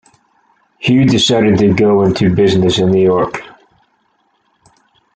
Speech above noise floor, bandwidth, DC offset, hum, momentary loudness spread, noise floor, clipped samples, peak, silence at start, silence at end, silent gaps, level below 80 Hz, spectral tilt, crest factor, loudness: 49 dB; 9.2 kHz; under 0.1%; none; 7 LU; -60 dBFS; under 0.1%; -2 dBFS; 0.8 s; 1.7 s; none; -44 dBFS; -6 dB/octave; 12 dB; -12 LUFS